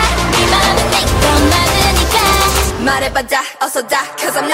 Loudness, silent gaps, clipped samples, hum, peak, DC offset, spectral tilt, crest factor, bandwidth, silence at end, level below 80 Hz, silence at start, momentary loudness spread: -12 LUFS; none; under 0.1%; none; 0 dBFS; under 0.1%; -3 dB/octave; 12 dB; 16.5 kHz; 0 s; -22 dBFS; 0 s; 7 LU